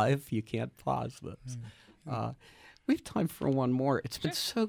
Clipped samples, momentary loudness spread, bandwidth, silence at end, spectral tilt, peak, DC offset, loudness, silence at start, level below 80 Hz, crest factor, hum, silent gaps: under 0.1%; 15 LU; over 20 kHz; 0 s; -6 dB/octave; -16 dBFS; under 0.1%; -33 LUFS; 0 s; -62 dBFS; 16 dB; none; none